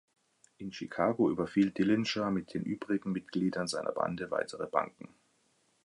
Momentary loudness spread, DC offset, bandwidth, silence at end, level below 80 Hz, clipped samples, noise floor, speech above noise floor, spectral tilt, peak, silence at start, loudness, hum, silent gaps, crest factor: 10 LU; under 0.1%; 11.5 kHz; 0.8 s; -68 dBFS; under 0.1%; -72 dBFS; 40 dB; -6 dB/octave; -12 dBFS; 0.6 s; -33 LUFS; none; none; 22 dB